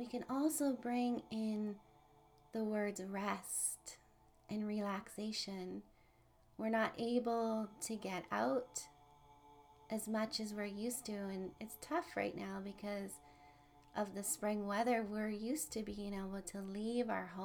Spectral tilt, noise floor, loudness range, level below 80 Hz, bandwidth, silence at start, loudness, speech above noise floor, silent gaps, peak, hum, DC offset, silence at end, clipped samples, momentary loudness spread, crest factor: -4 dB/octave; -69 dBFS; 4 LU; -70 dBFS; over 20 kHz; 0 s; -41 LUFS; 29 dB; none; -24 dBFS; none; under 0.1%; 0 s; under 0.1%; 10 LU; 18 dB